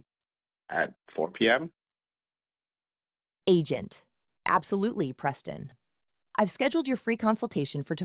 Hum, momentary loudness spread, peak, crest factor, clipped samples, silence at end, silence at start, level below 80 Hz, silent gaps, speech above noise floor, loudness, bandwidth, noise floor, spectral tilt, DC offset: none; 14 LU; -10 dBFS; 20 dB; under 0.1%; 0 s; 0.7 s; -70 dBFS; none; over 61 dB; -29 LUFS; 4 kHz; under -90 dBFS; -4.5 dB/octave; under 0.1%